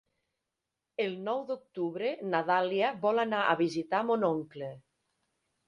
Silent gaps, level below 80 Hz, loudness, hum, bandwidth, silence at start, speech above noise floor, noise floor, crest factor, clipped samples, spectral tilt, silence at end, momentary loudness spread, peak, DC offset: none; -78 dBFS; -31 LUFS; none; 11 kHz; 1 s; 57 dB; -87 dBFS; 20 dB; under 0.1%; -6 dB/octave; 0.9 s; 11 LU; -12 dBFS; under 0.1%